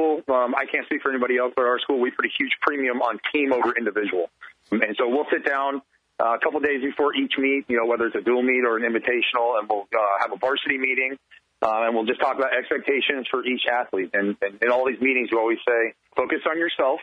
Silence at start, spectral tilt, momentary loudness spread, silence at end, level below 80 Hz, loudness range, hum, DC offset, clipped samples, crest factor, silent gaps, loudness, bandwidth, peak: 0 s; -6 dB/octave; 4 LU; 0 s; -68 dBFS; 2 LU; none; under 0.1%; under 0.1%; 20 dB; none; -23 LUFS; 6.6 kHz; -2 dBFS